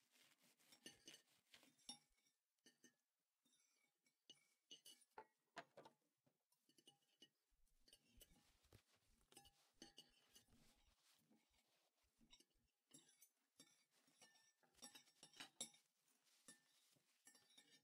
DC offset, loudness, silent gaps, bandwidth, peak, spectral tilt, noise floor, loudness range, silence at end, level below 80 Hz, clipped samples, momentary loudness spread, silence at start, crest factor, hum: under 0.1%; -64 LUFS; 6.46-6.50 s; 15.5 kHz; -36 dBFS; -1 dB/octave; under -90 dBFS; 5 LU; 0 s; under -90 dBFS; under 0.1%; 12 LU; 0 s; 34 dB; none